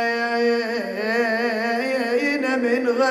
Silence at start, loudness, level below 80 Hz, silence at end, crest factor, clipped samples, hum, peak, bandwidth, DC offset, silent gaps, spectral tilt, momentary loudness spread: 0 s; -21 LUFS; -68 dBFS; 0 s; 12 dB; under 0.1%; none; -8 dBFS; 15 kHz; under 0.1%; none; -4 dB/octave; 3 LU